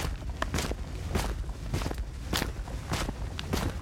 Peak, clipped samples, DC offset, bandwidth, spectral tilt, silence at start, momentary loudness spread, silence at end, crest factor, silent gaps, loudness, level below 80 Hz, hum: -10 dBFS; under 0.1%; under 0.1%; 17 kHz; -4.5 dB/octave; 0 s; 6 LU; 0 s; 22 dB; none; -34 LUFS; -36 dBFS; none